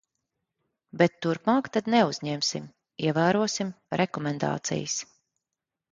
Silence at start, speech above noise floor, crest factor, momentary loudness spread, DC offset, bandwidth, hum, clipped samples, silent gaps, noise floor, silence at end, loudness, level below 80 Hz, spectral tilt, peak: 0.95 s; 61 dB; 22 dB; 9 LU; under 0.1%; 9.4 kHz; none; under 0.1%; none; -87 dBFS; 0.9 s; -27 LUFS; -68 dBFS; -4.5 dB/octave; -6 dBFS